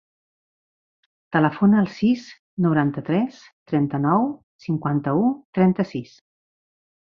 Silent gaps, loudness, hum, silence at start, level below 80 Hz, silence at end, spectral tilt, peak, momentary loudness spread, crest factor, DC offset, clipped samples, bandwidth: 2.39-2.57 s, 3.52-3.66 s, 4.43-4.59 s, 5.45-5.53 s; -22 LUFS; none; 1.3 s; -62 dBFS; 0.95 s; -9 dB/octave; -4 dBFS; 10 LU; 20 dB; under 0.1%; under 0.1%; 6.8 kHz